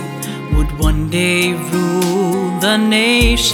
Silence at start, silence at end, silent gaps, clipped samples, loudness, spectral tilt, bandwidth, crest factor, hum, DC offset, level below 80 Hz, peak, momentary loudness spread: 0 s; 0 s; none; under 0.1%; -15 LUFS; -4.5 dB/octave; 18 kHz; 14 dB; none; under 0.1%; -22 dBFS; -2 dBFS; 7 LU